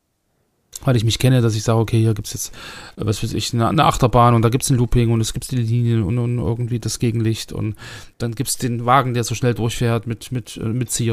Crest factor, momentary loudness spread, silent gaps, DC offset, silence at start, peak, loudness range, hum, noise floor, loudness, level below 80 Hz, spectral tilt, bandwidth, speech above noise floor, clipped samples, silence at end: 18 dB; 12 LU; none; under 0.1%; 0.75 s; 0 dBFS; 4 LU; none; -67 dBFS; -19 LUFS; -36 dBFS; -5.5 dB/octave; 15.5 kHz; 49 dB; under 0.1%; 0 s